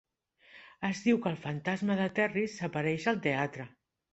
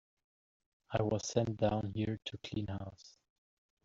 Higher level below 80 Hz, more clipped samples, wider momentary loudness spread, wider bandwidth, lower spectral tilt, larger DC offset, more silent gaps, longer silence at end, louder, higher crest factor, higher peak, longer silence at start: second, -70 dBFS vs -62 dBFS; neither; about the same, 8 LU vs 9 LU; about the same, 8.2 kHz vs 7.8 kHz; about the same, -6 dB/octave vs -6 dB/octave; neither; neither; second, 0.45 s vs 0.75 s; first, -32 LUFS vs -37 LUFS; about the same, 18 dB vs 22 dB; about the same, -14 dBFS vs -16 dBFS; second, 0.55 s vs 0.9 s